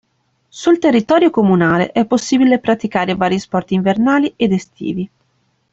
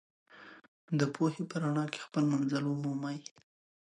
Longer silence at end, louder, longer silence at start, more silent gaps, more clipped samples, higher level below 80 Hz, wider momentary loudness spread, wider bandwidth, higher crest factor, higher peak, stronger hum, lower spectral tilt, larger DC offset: about the same, 0.65 s vs 0.65 s; first, -15 LUFS vs -34 LUFS; first, 0.55 s vs 0.35 s; second, none vs 0.68-0.88 s; neither; first, -52 dBFS vs -80 dBFS; second, 9 LU vs 22 LU; second, 8 kHz vs 11.5 kHz; about the same, 14 dB vs 18 dB; first, -2 dBFS vs -16 dBFS; neither; about the same, -6 dB/octave vs -6.5 dB/octave; neither